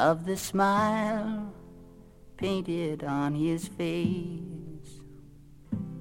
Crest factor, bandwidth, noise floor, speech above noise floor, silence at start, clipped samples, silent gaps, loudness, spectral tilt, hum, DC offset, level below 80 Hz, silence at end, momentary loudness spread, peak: 20 dB; 16.5 kHz; -51 dBFS; 23 dB; 0 s; under 0.1%; none; -30 LUFS; -6 dB/octave; none; under 0.1%; -56 dBFS; 0 s; 20 LU; -12 dBFS